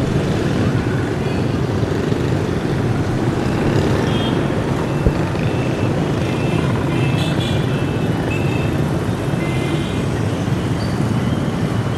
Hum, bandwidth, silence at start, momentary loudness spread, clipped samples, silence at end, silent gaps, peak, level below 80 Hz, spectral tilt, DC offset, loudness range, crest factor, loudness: none; 13.5 kHz; 0 s; 2 LU; under 0.1%; 0 s; none; 0 dBFS; -32 dBFS; -7 dB/octave; under 0.1%; 1 LU; 18 dB; -19 LUFS